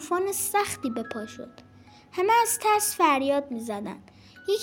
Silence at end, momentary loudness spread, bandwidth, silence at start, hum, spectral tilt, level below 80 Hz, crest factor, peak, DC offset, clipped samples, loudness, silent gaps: 0 s; 18 LU; 17 kHz; 0 s; none; -2.5 dB/octave; -66 dBFS; 18 dB; -8 dBFS; under 0.1%; under 0.1%; -25 LUFS; none